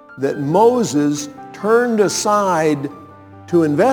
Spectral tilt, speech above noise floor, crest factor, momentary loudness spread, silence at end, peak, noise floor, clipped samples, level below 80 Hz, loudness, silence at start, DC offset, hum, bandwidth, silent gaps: -5 dB/octave; 23 dB; 16 dB; 11 LU; 0 s; -2 dBFS; -39 dBFS; under 0.1%; -64 dBFS; -16 LUFS; 0.1 s; under 0.1%; none; 19 kHz; none